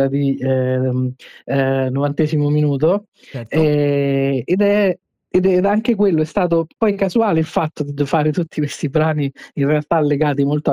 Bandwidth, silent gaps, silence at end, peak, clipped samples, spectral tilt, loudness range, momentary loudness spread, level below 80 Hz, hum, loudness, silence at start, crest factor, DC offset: 11 kHz; 3.08-3.12 s; 0 s; -4 dBFS; under 0.1%; -8 dB/octave; 2 LU; 7 LU; -52 dBFS; none; -18 LUFS; 0 s; 12 dB; under 0.1%